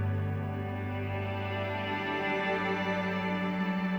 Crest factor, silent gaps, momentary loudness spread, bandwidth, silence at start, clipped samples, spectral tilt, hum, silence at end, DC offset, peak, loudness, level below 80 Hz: 14 dB; none; 5 LU; over 20 kHz; 0 s; under 0.1%; -7.5 dB/octave; none; 0 s; under 0.1%; -18 dBFS; -32 LUFS; -62 dBFS